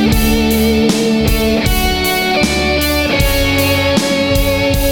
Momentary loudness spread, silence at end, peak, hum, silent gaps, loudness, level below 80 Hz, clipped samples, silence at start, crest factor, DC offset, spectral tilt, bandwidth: 1 LU; 0 s; 0 dBFS; none; none; -13 LUFS; -20 dBFS; under 0.1%; 0 s; 12 dB; under 0.1%; -4.5 dB/octave; 19 kHz